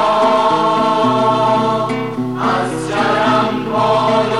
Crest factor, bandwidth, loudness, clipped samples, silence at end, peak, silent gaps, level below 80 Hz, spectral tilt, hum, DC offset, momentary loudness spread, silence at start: 12 dB; 12 kHz; -15 LUFS; under 0.1%; 0 s; -4 dBFS; none; -54 dBFS; -5.5 dB/octave; none; 0.6%; 6 LU; 0 s